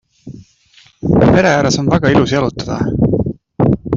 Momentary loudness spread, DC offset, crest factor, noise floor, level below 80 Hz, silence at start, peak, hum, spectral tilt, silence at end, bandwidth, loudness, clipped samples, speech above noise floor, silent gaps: 9 LU; under 0.1%; 14 dB; -48 dBFS; -34 dBFS; 0.25 s; 0 dBFS; none; -6.5 dB/octave; 0 s; 7.6 kHz; -14 LUFS; under 0.1%; 36 dB; none